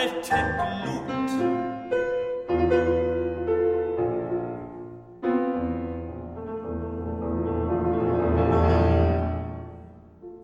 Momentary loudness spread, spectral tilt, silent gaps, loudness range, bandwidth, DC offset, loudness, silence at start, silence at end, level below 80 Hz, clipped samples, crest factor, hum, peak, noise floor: 15 LU; -7.5 dB/octave; none; 5 LU; 12.5 kHz; under 0.1%; -26 LUFS; 0 s; 0 s; -38 dBFS; under 0.1%; 16 dB; none; -8 dBFS; -45 dBFS